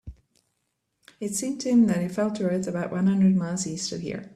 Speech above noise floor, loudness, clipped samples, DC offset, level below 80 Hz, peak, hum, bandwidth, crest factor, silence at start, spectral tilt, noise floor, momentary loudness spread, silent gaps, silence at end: 53 dB; -25 LUFS; under 0.1%; under 0.1%; -56 dBFS; -10 dBFS; none; 13 kHz; 14 dB; 0.05 s; -6 dB/octave; -77 dBFS; 10 LU; none; 0 s